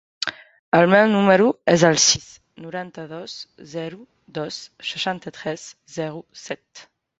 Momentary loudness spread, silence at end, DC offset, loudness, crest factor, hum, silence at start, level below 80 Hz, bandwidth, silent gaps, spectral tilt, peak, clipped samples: 20 LU; 0.4 s; under 0.1%; -19 LUFS; 20 dB; none; 0.2 s; -60 dBFS; 8 kHz; 0.59-0.72 s; -3.5 dB/octave; -2 dBFS; under 0.1%